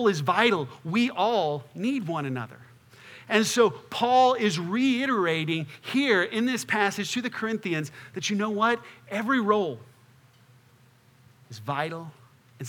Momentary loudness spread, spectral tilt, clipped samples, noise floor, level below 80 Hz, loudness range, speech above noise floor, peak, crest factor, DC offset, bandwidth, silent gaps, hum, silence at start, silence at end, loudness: 11 LU; -4.5 dB/octave; under 0.1%; -58 dBFS; -78 dBFS; 6 LU; 33 dB; -4 dBFS; 22 dB; under 0.1%; 19.5 kHz; none; none; 0 s; 0 s; -26 LUFS